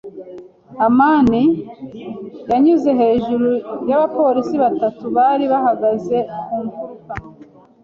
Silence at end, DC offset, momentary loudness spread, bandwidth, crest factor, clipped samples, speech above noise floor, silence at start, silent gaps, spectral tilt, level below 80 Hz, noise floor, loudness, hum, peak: 0.4 s; under 0.1%; 18 LU; 7 kHz; 14 dB; under 0.1%; 28 dB; 0.05 s; none; -8 dB/octave; -50 dBFS; -44 dBFS; -16 LUFS; none; -2 dBFS